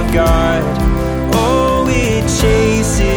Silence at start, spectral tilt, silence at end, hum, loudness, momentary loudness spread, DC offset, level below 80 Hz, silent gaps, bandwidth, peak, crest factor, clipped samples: 0 s; -5.5 dB/octave; 0 s; none; -13 LUFS; 4 LU; under 0.1%; -18 dBFS; none; over 20 kHz; 0 dBFS; 12 dB; under 0.1%